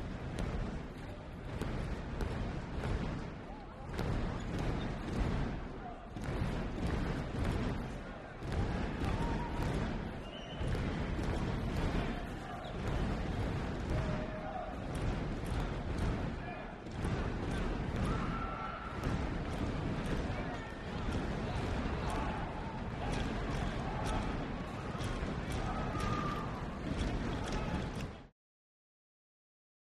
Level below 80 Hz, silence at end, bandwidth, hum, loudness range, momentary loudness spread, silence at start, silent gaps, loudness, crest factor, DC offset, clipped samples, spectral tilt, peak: -42 dBFS; 1.7 s; 13 kHz; none; 2 LU; 7 LU; 0 s; none; -39 LUFS; 16 dB; under 0.1%; under 0.1%; -6.5 dB/octave; -22 dBFS